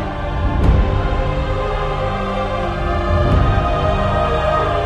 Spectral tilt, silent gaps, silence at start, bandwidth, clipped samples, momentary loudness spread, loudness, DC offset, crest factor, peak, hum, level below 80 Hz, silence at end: -7.5 dB/octave; none; 0 s; 8.8 kHz; under 0.1%; 5 LU; -18 LUFS; under 0.1%; 14 dB; -2 dBFS; none; -20 dBFS; 0 s